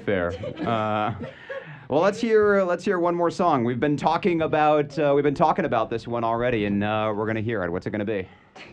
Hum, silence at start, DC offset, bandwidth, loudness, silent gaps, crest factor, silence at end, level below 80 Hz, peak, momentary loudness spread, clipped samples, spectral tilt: none; 0 s; under 0.1%; 9.2 kHz; -23 LUFS; none; 18 dB; 0 s; -54 dBFS; -4 dBFS; 9 LU; under 0.1%; -7 dB/octave